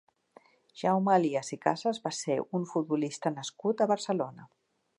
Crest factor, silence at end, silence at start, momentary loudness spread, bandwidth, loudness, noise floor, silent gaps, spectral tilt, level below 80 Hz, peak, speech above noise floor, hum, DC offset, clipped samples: 20 dB; 0.55 s; 0.75 s; 8 LU; 11 kHz; -30 LUFS; -61 dBFS; none; -5.5 dB/octave; -82 dBFS; -10 dBFS; 31 dB; none; under 0.1%; under 0.1%